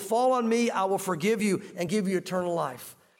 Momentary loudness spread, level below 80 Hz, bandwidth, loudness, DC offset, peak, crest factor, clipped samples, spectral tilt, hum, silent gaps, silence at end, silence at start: 7 LU; -74 dBFS; 17 kHz; -27 LUFS; under 0.1%; -16 dBFS; 12 dB; under 0.1%; -5 dB/octave; none; none; 0.25 s; 0 s